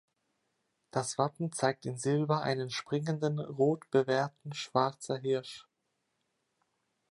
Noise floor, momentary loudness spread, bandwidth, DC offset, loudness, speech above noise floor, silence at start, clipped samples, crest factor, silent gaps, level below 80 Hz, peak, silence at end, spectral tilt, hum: -81 dBFS; 7 LU; 11.5 kHz; under 0.1%; -32 LUFS; 49 dB; 0.95 s; under 0.1%; 22 dB; none; -78 dBFS; -12 dBFS; 1.5 s; -5.5 dB/octave; none